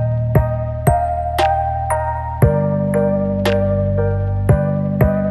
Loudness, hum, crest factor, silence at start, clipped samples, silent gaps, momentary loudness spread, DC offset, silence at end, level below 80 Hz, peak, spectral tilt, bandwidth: -17 LUFS; none; 16 dB; 0 s; under 0.1%; none; 3 LU; under 0.1%; 0 s; -28 dBFS; 0 dBFS; -7.5 dB/octave; 13 kHz